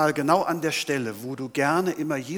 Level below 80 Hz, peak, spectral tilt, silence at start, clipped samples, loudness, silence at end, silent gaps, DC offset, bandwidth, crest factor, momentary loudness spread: -72 dBFS; -6 dBFS; -4.5 dB/octave; 0 s; under 0.1%; -25 LUFS; 0 s; none; under 0.1%; over 20 kHz; 18 dB; 8 LU